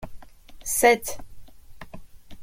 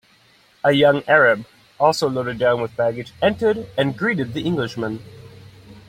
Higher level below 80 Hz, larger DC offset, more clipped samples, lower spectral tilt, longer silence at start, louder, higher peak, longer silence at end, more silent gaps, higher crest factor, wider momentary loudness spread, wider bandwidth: first, -48 dBFS vs -56 dBFS; neither; neither; second, -2 dB/octave vs -5.5 dB/octave; second, 0 s vs 0.65 s; second, -22 LUFS vs -19 LUFS; about the same, -4 dBFS vs -2 dBFS; about the same, 0 s vs 0.1 s; neither; about the same, 22 dB vs 18 dB; first, 26 LU vs 10 LU; about the same, 16.5 kHz vs 15 kHz